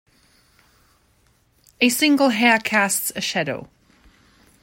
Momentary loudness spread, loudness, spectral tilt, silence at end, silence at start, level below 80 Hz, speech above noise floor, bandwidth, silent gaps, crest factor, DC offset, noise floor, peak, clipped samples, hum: 9 LU; -18 LUFS; -2.5 dB/octave; 1 s; 1.8 s; -62 dBFS; 42 dB; 16.5 kHz; none; 20 dB; under 0.1%; -61 dBFS; -2 dBFS; under 0.1%; none